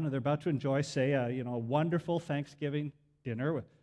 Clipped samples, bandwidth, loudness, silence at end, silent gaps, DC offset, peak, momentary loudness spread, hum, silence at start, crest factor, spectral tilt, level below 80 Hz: under 0.1%; 11 kHz; -34 LUFS; 0.2 s; none; under 0.1%; -16 dBFS; 7 LU; none; 0 s; 18 dB; -7 dB/octave; -70 dBFS